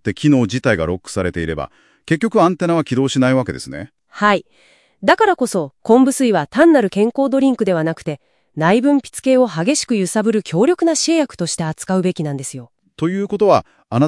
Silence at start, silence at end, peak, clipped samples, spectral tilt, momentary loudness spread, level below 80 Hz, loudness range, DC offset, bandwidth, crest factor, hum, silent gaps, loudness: 0.05 s; 0 s; 0 dBFS; under 0.1%; -5.5 dB/octave; 12 LU; -50 dBFS; 3 LU; under 0.1%; 12 kHz; 16 dB; none; none; -16 LUFS